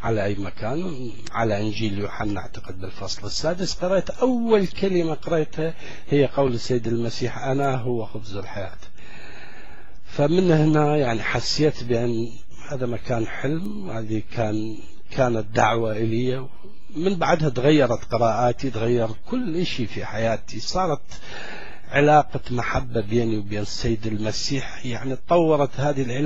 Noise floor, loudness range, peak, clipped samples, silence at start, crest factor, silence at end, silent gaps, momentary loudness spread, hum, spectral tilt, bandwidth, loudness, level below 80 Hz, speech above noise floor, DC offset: -45 dBFS; 5 LU; -4 dBFS; under 0.1%; 0 s; 20 dB; 0 s; none; 15 LU; none; -6 dB/octave; 8.2 kHz; -23 LUFS; -44 dBFS; 22 dB; 5%